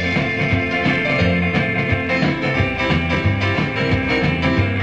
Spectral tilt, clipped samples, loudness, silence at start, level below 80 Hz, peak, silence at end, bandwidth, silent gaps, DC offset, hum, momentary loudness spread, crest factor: -7 dB/octave; under 0.1%; -18 LUFS; 0 s; -34 dBFS; -4 dBFS; 0 s; 8.8 kHz; none; 0.3%; none; 2 LU; 14 dB